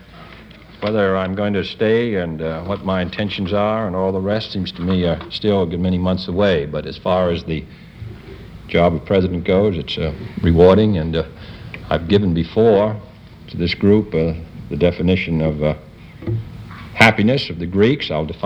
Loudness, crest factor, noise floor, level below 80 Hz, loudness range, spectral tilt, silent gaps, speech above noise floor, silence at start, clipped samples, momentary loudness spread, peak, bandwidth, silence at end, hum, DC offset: -18 LUFS; 18 dB; -40 dBFS; -38 dBFS; 4 LU; -7.5 dB/octave; none; 23 dB; 0.1 s; under 0.1%; 16 LU; 0 dBFS; 11 kHz; 0 s; none; under 0.1%